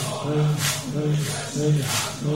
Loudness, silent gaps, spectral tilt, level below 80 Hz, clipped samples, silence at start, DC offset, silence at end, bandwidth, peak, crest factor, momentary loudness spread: -23 LUFS; none; -4.5 dB/octave; -54 dBFS; under 0.1%; 0 s; 0.2%; 0 s; 16 kHz; -10 dBFS; 14 dB; 4 LU